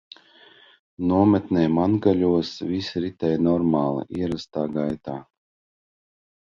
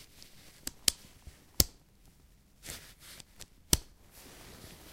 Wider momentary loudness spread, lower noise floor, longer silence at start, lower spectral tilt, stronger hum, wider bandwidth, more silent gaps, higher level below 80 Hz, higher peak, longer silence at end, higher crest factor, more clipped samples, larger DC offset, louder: second, 9 LU vs 25 LU; second, -52 dBFS vs -62 dBFS; first, 1 s vs 0.65 s; first, -8 dB/octave vs -1.5 dB/octave; neither; second, 7.2 kHz vs 16 kHz; neither; about the same, -50 dBFS vs -50 dBFS; second, -6 dBFS vs 0 dBFS; first, 1.25 s vs 0 s; second, 18 dB vs 38 dB; neither; neither; first, -23 LUFS vs -32 LUFS